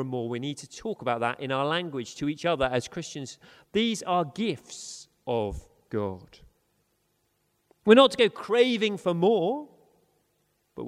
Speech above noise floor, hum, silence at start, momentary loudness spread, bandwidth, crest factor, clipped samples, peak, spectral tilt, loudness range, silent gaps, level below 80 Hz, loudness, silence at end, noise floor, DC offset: 46 dB; 50 Hz at -65 dBFS; 0 s; 18 LU; 13.5 kHz; 24 dB; under 0.1%; -4 dBFS; -5 dB/octave; 9 LU; none; -56 dBFS; -26 LUFS; 0 s; -73 dBFS; under 0.1%